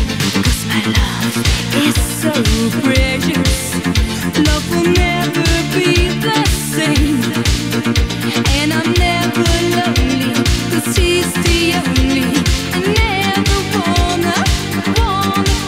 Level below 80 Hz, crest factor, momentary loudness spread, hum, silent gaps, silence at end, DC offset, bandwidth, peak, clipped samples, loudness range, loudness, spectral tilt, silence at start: -22 dBFS; 14 dB; 3 LU; none; none; 0 s; 0.4%; 16.5 kHz; 0 dBFS; under 0.1%; 1 LU; -14 LUFS; -4.5 dB/octave; 0 s